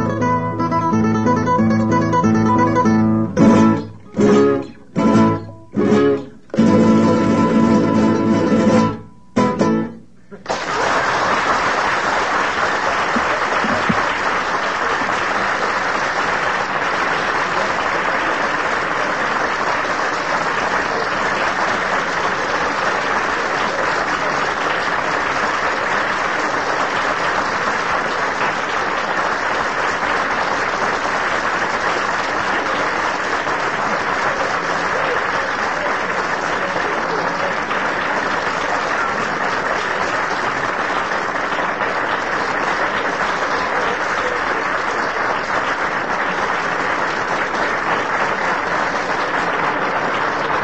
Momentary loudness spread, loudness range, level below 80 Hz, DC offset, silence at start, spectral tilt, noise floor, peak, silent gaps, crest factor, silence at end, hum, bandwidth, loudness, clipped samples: 4 LU; 4 LU; -46 dBFS; 0.8%; 0 s; -5 dB/octave; -40 dBFS; 0 dBFS; none; 18 dB; 0 s; none; 8.8 kHz; -17 LUFS; under 0.1%